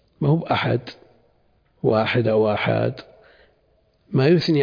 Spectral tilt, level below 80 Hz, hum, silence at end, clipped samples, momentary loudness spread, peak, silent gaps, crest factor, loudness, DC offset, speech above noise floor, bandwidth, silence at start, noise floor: -8 dB/octave; -58 dBFS; none; 0 s; under 0.1%; 9 LU; -4 dBFS; none; 16 dB; -21 LUFS; under 0.1%; 43 dB; 5.2 kHz; 0.2 s; -62 dBFS